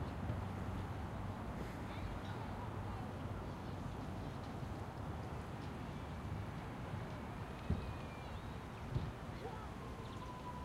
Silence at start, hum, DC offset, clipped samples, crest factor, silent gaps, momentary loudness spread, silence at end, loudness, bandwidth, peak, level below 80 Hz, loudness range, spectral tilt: 0 s; none; under 0.1%; under 0.1%; 20 dB; none; 5 LU; 0 s; -46 LUFS; 16 kHz; -26 dBFS; -52 dBFS; 1 LU; -7 dB/octave